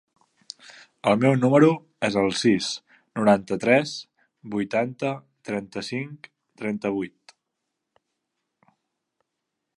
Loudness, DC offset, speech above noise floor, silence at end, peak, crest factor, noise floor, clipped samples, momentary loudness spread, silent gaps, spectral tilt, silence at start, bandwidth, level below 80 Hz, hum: -23 LUFS; under 0.1%; 59 dB; 2.7 s; -4 dBFS; 22 dB; -82 dBFS; under 0.1%; 18 LU; none; -5.5 dB/octave; 0.7 s; 11.5 kHz; -64 dBFS; none